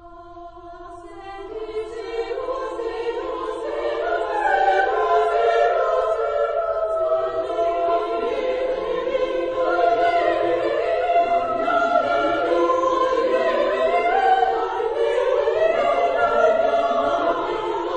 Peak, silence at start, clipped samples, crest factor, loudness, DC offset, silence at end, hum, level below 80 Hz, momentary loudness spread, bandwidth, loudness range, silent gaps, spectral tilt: -6 dBFS; 0 s; under 0.1%; 14 dB; -21 LUFS; under 0.1%; 0 s; none; -50 dBFS; 11 LU; 9 kHz; 7 LU; none; -4.5 dB/octave